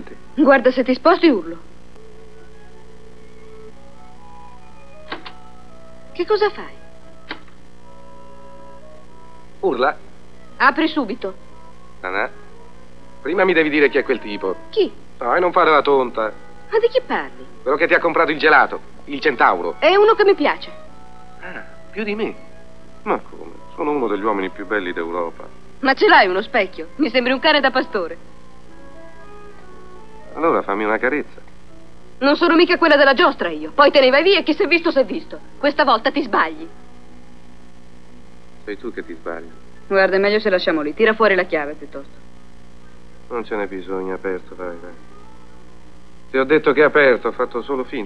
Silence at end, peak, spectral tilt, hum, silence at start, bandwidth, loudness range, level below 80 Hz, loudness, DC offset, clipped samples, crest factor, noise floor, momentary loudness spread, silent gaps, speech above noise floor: 0 s; 0 dBFS; -5.5 dB/octave; 60 Hz at -50 dBFS; 0 s; 9.8 kHz; 12 LU; -50 dBFS; -17 LUFS; 2%; under 0.1%; 20 dB; -45 dBFS; 21 LU; none; 28 dB